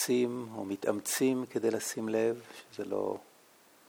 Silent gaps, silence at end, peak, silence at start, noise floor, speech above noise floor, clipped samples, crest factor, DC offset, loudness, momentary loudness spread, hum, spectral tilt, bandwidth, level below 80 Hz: none; 0.65 s; -14 dBFS; 0 s; -61 dBFS; 29 dB; under 0.1%; 18 dB; under 0.1%; -33 LUFS; 12 LU; none; -4 dB/octave; 19.5 kHz; -84 dBFS